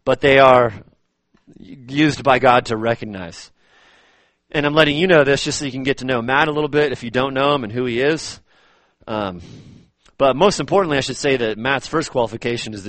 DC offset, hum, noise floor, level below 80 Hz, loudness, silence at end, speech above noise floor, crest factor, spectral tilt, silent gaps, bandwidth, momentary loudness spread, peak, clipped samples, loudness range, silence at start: under 0.1%; none; -62 dBFS; -48 dBFS; -17 LUFS; 0 s; 45 dB; 18 dB; -4.5 dB/octave; none; 8.8 kHz; 12 LU; 0 dBFS; under 0.1%; 4 LU; 0.05 s